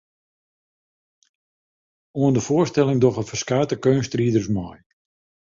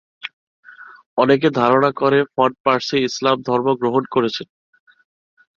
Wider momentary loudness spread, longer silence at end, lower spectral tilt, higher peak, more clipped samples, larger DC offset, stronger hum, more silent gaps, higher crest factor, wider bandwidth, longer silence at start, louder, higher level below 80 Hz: second, 8 LU vs 15 LU; second, 0.65 s vs 1.1 s; about the same, -6.5 dB/octave vs -5.5 dB/octave; about the same, -4 dBFS vs -2 dBFS; neither; neither; neither; second, none vs 0.33-0.63 s, 1.06-1.17 s, 2.60-2.64 s; about the same, 20 dB vs 18 dB; about the same, 7.6 kHz vs 7.4 kHz; first, 2.15 s vs 0.25 s; second, -21 LUFS vs -18 LUFS; first, -54 dBFS vs -62 dBFS